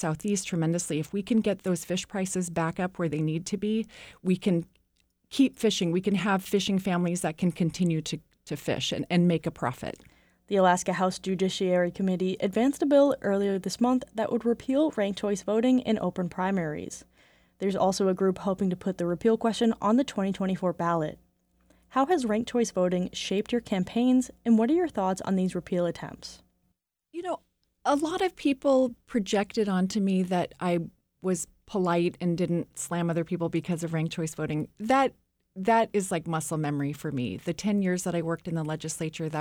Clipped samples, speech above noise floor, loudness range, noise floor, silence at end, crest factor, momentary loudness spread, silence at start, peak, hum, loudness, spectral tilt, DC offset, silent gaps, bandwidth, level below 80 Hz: under 0.1%; 49 dB; 4 LU; -76 dBFS; 0 s; 18 dB; 8 LU; 0 s; -8 dBFS; none; -28 LUFS; -5.5 dB/octave; under 0.1%; none; 16.5 kHz; -60 dBFS